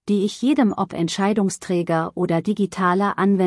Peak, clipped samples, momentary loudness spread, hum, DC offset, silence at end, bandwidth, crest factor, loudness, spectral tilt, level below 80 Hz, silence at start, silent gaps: -6 dBFS; under 0.1%; 4 LU; none; under 0.1%; 0 s; 12 kHz; 14 dB; -21 LUFS; -6 dB/octave; -62 dBFS; 0.05 s; none